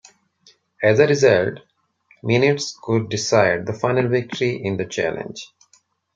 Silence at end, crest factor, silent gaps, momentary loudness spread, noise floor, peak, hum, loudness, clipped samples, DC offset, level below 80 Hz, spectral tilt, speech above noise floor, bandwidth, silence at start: 0.7 s; 18 dB; none; 16 LU; -60 dBFS; -2 dBFS; none; -19 LUFS; under 0.1%; under 0.1%; -60 dBFS; -5 dB/octave; 41 dB; 8.8 kHz; 0.8 s